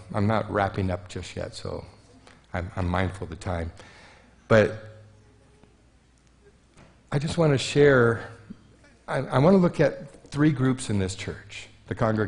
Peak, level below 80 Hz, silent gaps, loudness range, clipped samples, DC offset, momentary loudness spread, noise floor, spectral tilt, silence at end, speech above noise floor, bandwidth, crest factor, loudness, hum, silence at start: -6 dBFS; -50 dBFS; none; 8 LU; under 0.1%; under 0.1%; 18 LU; -59 dBFS; -6.5 dB/octave; 0 s; 35 dB; 10.5 kHz; 20 dB; -25 LUFS; none; 0 s